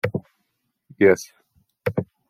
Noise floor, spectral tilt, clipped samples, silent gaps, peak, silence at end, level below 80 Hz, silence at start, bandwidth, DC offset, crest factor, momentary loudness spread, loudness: -74 dBFS; -6.5 dB/octave; under 0.1%; none; -4 dBFS; 0.25 s; -62 dBFS; 0.05 s; 15 kHz; under 0.1%; 22 dB; 15 LU; -22 LUFS